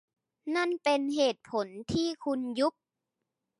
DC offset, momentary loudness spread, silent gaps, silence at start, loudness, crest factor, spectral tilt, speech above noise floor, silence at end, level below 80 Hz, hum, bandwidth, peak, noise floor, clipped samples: under 0.1%; 7 LU; none; 0.45 s; -31 LUFS; 18 dB; -4.5 dB/octave; 57 dB; 0.9 s; -64 dBFS; none; 11.5 kHz; -14 dBFS; -86 dBFS; under 0.1%